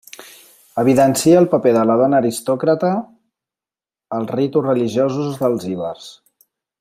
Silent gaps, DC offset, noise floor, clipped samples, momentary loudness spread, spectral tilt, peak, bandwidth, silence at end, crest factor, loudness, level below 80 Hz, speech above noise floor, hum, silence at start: none; under 0.1%; under -90 dBFS; under 0.1%; 15 LU; -6 dB/octave; -2 dBFS; 16 kHz; 0.7 s; 16 dB; -17 LUFS; -60 dBFS; over 74 dB; none; 0.2 s